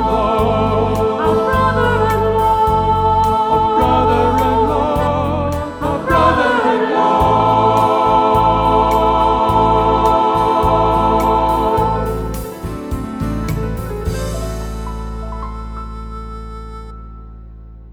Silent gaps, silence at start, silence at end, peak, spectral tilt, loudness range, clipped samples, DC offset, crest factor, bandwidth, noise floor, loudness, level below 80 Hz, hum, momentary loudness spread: none; 0 s; 0 s; -2 dBFS; -6.5 dB/octave; 12 LU; under 0.1%; under 0.1%; 14 dB; 19.5 kHz; -35 dBFS; -15 LUFS; -28 dBFS; none; 14 LU